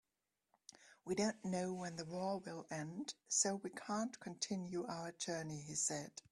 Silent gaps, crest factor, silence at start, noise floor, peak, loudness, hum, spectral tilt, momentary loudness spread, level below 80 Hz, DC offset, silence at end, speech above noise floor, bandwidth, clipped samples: none; 22 dB; 0.8 s; -90 dBFS; -22 dBFS; -42 LUFS; none; -3.5 dB/octave; 10 LU; -80 dBFS; under 0.1%; 0.1 s; 47 dB; 12.5 kHz; under 0.1%